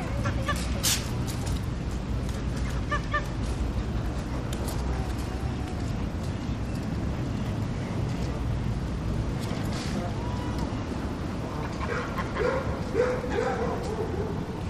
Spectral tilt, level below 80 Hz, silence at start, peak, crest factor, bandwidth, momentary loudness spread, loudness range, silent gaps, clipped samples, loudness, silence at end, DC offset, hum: -5.5 dB/octave; -34 dBFS; 0 s; -10 dBFS; 18 dB; 15.5 kHz; 5 LU; 2 LU; none; under 0.1%; -30 LUFS; 0 s; 0.1%; none